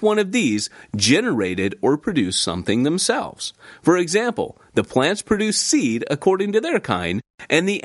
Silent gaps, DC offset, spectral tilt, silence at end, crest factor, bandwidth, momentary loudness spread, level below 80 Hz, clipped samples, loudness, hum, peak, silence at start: 7.30-7.34 s; under 0.1%; -4 dB/octave; 0.05 s; 18 dB; 11.5 kHz; 7 LU; -54 dBFS; under 0.1%; -20 LUFS; none; -2 dBFS; 0 s